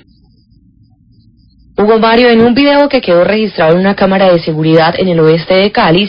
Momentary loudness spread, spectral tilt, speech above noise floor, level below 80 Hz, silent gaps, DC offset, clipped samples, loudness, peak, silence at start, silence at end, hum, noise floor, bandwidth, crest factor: 4 LU; -9 dB/octave; 38 dB; -40 dBFS; none; under 0.1%; 0.3%; -8 LUFS; 0 dBFS; 1.8 s; 0 s; none; -46 dBFS; 5.4 kHz; 10 dB